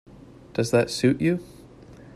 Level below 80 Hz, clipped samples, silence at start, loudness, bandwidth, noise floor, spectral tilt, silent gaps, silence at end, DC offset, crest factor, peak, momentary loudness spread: -56 dBFS; under 0.1%; 0.55 s; -24 LUFS; 14 kHz; -47 dBFS; -6 dB/octave; none; 0.05 s; under 0.1%; 18 dB; -6 dBFS; 9 LU